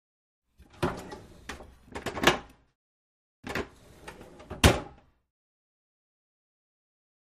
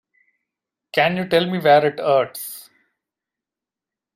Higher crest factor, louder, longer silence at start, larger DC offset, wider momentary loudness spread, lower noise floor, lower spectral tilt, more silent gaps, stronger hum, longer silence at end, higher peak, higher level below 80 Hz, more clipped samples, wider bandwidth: first, 30 dB vs 18 dB; second, -28 LUFS vs -18 LUFS; second, 0.8 s vs 0.95 s; neither; first, 24 LU vs 16 LU; second, -49 dBFS vs -88 dBFS; about the same, -4 dB/octave vs -5 dB/octave; first, 2.75-3.43 s vs none; neither; first, 2.4 s vs 1.55 s; about the same, -4 dBFS vs -4 dBFS; first, -44 dBFS vs -66 dBFS; neither; about the same, 15 kHz vs 16 kHz